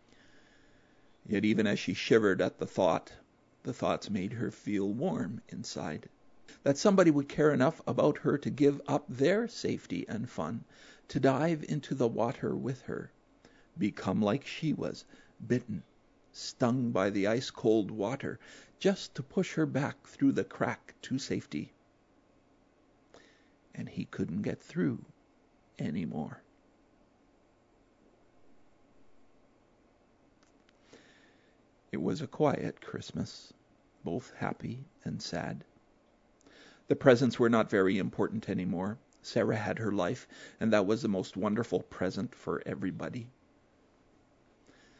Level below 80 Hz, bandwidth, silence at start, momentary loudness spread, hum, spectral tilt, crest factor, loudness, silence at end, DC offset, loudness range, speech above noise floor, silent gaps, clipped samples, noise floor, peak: -68 dBFS; 8 kHz; 1.3 s; 15 LU; none; -6.5 dB/octave; 24 dB; -32 LUFS; 1.7 s; under 0.1%; 11 LU; 35 dB; none; under 0.1%; -66 dBFS; -8 dBFS